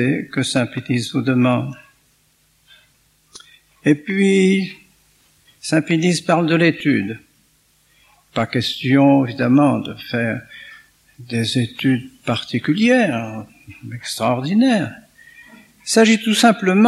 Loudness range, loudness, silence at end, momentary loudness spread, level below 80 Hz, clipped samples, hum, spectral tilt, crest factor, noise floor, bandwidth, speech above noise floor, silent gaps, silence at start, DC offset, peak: 4 LU; -17 LUFS; 0 s; 15 LU; -62 dBFS; under 0.1%; none; -5.5 dB/octave; 18 dB; -59 dBFS; 13.5 kHz; 42 dB; none; 0 s; under 0.1%; 0 dBFS